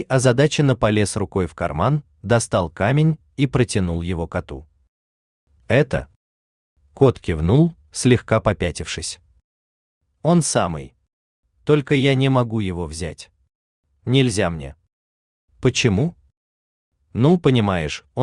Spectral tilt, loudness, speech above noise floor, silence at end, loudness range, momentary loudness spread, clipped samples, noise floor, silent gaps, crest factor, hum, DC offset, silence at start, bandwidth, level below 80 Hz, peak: -6 dB/octave; -20 LUFS; over 71 dB; 0 s; 4 LU; 12 LU; under 0.1%; under -90 dBFS; 4.88-5.47 s, 6.16-6.76 s, 9.44-10.01 s, 11.13-11.43 s, 13.55-13.83 s, 14.93-15.48 s, 16.37-16.92 s; 18 dB; none; under 0.1%; 0 s; 11 kHz; -44 dBFS; -2 dBFS